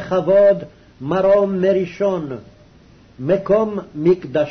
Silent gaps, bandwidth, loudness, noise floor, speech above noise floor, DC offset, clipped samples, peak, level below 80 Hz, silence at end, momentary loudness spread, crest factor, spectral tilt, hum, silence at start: none; 6.4 kHz; -17 LUFS; -47 dBFS; 31 dB; under 0.1%; under 0.1%; -6 dBFS; -52 dBFS; 0 s; 14 LU; 12 dB; -8.5 dB/octave; none; 0 s